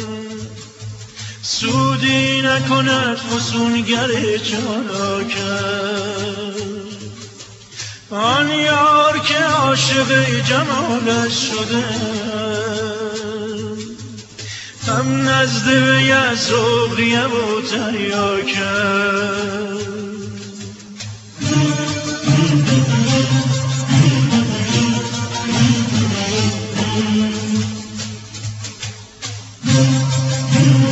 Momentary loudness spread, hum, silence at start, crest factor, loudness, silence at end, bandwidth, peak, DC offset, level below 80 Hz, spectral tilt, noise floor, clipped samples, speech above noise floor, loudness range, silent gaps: 16 LU; none; 0 s; 16 dB; -16 LUFS; 0 s; 8.2 kHz; 0 dBFS; under 0.1%; -50 dBFS; -4.5 dB/octave; -37 dBFS; under 0.1%; 21 dB; 7 LU; none